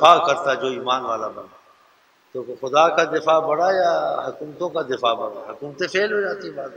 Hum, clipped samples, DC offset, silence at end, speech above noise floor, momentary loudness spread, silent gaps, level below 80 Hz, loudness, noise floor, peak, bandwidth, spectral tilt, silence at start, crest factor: none; under 0.1%; under 0.1%; 0 s; 37 dB; 15 LU; none; -70 dBFS; -21 LUFS; -57 dBFS; 0 dBFS; 9.4 kHz; -3.5 dB/octave; 0 s; 20 dB